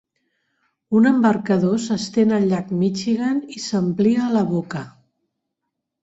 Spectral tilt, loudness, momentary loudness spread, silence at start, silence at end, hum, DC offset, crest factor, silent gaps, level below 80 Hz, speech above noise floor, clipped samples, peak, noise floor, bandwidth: -6.5 dB/octave; -19 LUFS; 9 LU; 0.9 s; 1.15 s; none; under 0.1%; 16 dB; none; -62 dBFS; 61 dB; under 0.1%; -4 dBFS; -80 dBFS; 8 kHz